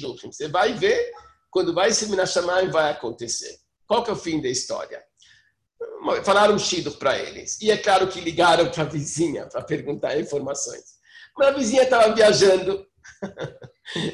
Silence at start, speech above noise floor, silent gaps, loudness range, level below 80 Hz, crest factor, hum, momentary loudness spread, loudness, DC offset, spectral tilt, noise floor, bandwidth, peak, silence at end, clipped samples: 0 s; 38 dB; none; 5 LU; -56 dBFS; 18 dB; none; 16 LU; -21 LUFS; under 0.1%; -3.5 dB/octave; -60 dBFS; 12 kHz; -4 dBFS; 0 s; under 0.1%